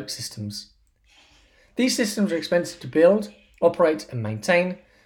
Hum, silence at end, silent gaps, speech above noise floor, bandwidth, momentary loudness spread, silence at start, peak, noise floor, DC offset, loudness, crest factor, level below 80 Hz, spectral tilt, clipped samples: none; 0.3 s; none; 36 dB; 18 kHz; 15 LU; 0 s; -6 dBFS; -58 dBFS; under 0.1%; -23 LUFS; 18 dB; -62 dBFS; -4.5 dB/octave; under 0.1%